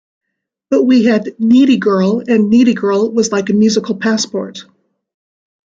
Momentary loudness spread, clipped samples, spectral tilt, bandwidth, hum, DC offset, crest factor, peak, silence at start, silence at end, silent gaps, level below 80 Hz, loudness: 7 LU; under 0.1%; -5.5 dB/octave; 7.8 kHz; none; under 0.1%; 12 dB; -2 dBFS; 0.7 s; 1.05 s; none; -58 dBFS; -12 LUFS